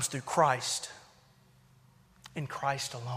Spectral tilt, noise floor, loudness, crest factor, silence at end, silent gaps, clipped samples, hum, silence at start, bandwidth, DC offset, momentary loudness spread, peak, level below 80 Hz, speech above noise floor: -3 dB/octave; -62 dBFS; -31 LUFS; 22 dB; 0 s; none; under 0.1%; none; 0 s; 15.5 kHz; under 0.1%; 17 LU; -12 dBFS; -70 dBFS; 30 dB